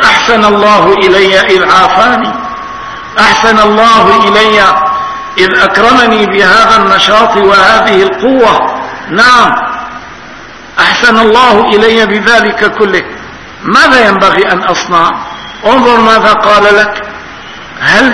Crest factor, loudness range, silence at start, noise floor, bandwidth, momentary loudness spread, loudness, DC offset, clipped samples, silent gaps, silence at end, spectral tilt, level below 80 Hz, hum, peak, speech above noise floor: 6 dB; 3 LU; 0 s; -27 dBFS; 11 kHz; 15 LU; -5 LUFS; 0.6%; 6%; none; 0 s; -3.5 dB/octave; -36 dBFS; none; 0 dBFS; 22 dB